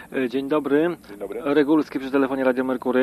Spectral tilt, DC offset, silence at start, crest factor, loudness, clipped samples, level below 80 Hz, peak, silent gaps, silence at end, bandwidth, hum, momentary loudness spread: -6.5 dB/octave; under 0.1%; 0 s; 16 dB; -22 LUFS; under 0.1%; -60 dBFS; -6 dBFS; none; 0 s; 13 kHz; none; 8 LU